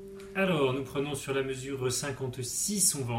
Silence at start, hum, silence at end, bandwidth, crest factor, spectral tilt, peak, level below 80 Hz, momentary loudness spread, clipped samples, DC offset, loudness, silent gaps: 0 s; none; 0 s; 16 kHz; 20 dB; -3.5 dB/octave; -10 dBFS; -58 dBFS; 10 LU; under 0.1%; under 0.1%; -30 LUFS; none